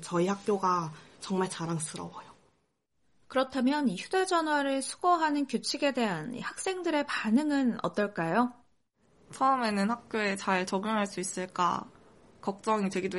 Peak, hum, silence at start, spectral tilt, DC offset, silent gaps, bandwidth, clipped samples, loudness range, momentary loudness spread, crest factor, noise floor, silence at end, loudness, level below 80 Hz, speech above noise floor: -14 dBFS; none; 0 s; -4.5 dB/octave; under 0.1%; none; 11.5 kHz; under 0.1%; 4 LU; 8 LU; 18 dB; -76 dBFS; 0 s; -30 LUFS; -72 dBFS; 46 dB